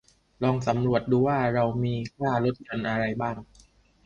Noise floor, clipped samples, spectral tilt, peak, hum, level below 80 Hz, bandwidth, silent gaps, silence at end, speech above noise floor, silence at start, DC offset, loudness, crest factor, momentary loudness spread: -58 dBFS; under 0.1%; -8 dB/octave; -8 dBFS; none; -54 dBFS; 7.4 kHz; none; 0.6 s; 32 dB; 0.4 s; under 0.1%; -26 LUFS; 18 dB; 8 LU